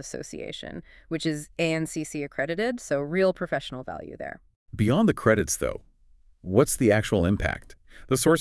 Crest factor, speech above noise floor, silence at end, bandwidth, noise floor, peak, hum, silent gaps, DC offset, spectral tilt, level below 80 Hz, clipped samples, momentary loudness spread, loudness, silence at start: 20 dB; 32 dB; 0 s; 12 kHz; -57 dBFS; -6 dBFS; none; 4.56-4.66 s; under 0.1%; -5 dB/octave; -48 dBFS; under 0.1%; 16 LU; -26 LUFS; 0 s